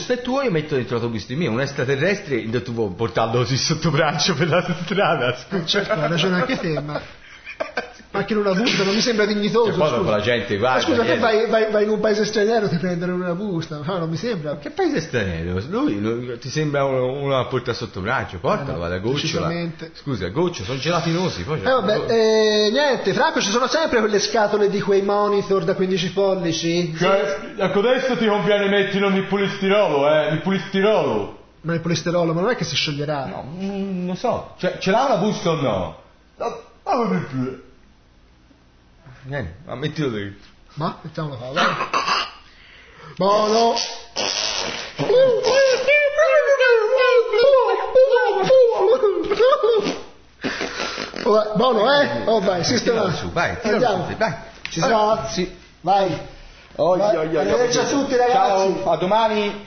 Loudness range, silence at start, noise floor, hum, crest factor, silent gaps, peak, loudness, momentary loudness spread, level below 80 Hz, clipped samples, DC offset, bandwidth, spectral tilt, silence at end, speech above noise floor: 7 LU; 0 s; -52 dBFS; none; 14 dB; none; -6 dBFS; -20 LUFS; 11 LU; -48 dBFS; under 0.1%; under 0.1%; 6.6 kHz; -5 dB/octave; 0 s; 32 dB